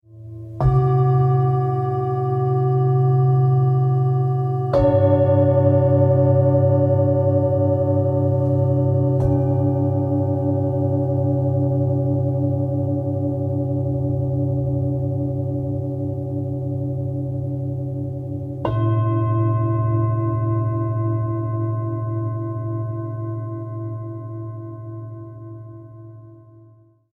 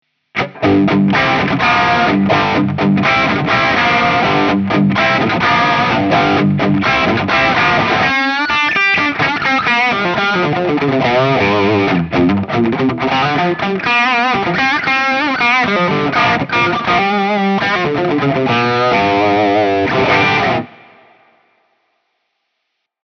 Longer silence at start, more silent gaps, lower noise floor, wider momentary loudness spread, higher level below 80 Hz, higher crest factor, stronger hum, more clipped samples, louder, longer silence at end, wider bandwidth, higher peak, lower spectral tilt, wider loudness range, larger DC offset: second, 0.1 s vs 0.35 s; neither; second, -51 dBFS vs -72 dBFS; first, 13 LU vs 3 LU; about the same, -42 dBFS vs -46 dBFS; about the same, 14 dB vs 14 dB; neither; neither; second, -20 LUFS vs -13 LUFS; second, 0.8 s vs 2.35 s; second, 3.4 kHz vs 6.8 kHz; second, -4 dBFS vs 0 dBFS; first, -12 dB/octave vs -6 dB/octave; first, 10 LU vs 2 LU; neither